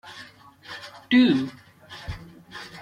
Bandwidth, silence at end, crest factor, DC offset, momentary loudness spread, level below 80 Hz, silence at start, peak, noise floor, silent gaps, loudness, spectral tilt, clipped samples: 10 kHz; 0 s; 18 dB; under 0.1%; 24 LU; -50 dBFS; 0.05 s; -8 dBFS; -47 dBFS; none; -21 LUFS; -6 dB/octave; under 0.1%